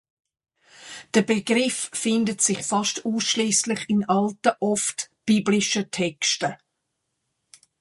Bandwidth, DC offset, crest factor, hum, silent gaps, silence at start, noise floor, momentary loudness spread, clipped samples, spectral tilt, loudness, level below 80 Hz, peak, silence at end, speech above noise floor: 11.5 kHz; under 0.1%; 20 dB; none; none; 0.8 s; -78 dBFS; 6 LU; under 0.1%; -3 dB/octave; -23 LUFS; -68 dBFS; -6 dBFS; 1.25 s; 55 dB